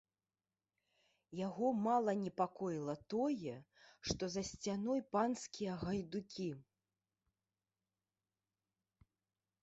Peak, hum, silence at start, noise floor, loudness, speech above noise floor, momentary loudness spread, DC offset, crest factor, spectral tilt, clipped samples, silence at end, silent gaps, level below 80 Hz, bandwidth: -22 dBFS; none; 1.3 s; under -90 dBFS; -40 LUFS; over 50 dB; 10 LU; under 0.1%; 20 dB; -5.5 dB/octave; under 0.1%; 3 s; none; -70 dBFS; 8 kHz